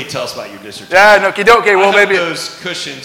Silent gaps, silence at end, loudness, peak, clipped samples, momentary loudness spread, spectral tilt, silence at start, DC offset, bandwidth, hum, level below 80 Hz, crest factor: none; 0 s; -10 LUFS; 0 dBFS; under 0.1%; 17 LU; -3 dB/octave; 0 s; under 0.1%; 20 kHz; none; -46 dBFS; 12 dB